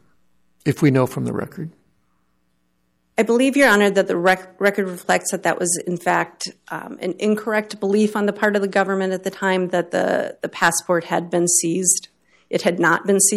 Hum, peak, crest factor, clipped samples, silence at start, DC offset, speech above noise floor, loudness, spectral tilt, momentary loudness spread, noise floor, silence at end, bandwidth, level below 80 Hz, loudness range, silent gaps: none; -4 dBFS; 16 dB; under 0.1%; 0.65 s; under 0.1%; 49 dB; -19 LUFS; -4 dB/octave; 11 LU; -68 dBFS; 0 s; 15.5 kHz; -62 dBFS; 3 LU; none